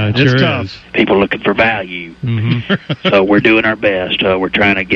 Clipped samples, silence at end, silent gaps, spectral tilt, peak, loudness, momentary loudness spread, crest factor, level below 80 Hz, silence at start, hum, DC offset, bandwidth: under 0.1%; 0 s; none; -7.5 dB/octave; 0 dBFS; -13 LUFS; 10 LU; 12 dB; -42 dBFS; 0 s; none; under 0.1%; 7.2 kHz